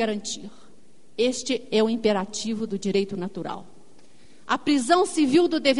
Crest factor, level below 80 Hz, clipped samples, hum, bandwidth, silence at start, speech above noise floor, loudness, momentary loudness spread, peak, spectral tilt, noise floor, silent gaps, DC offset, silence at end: 20 dB; -62 dBFS; under 0.1%; none; 11 kHz; 0 s; 34 dB; -24 LUFS; 15 LU; -6 dBFS; -4 dB/octave; -57 dBFS; none; 0.8%; 0 s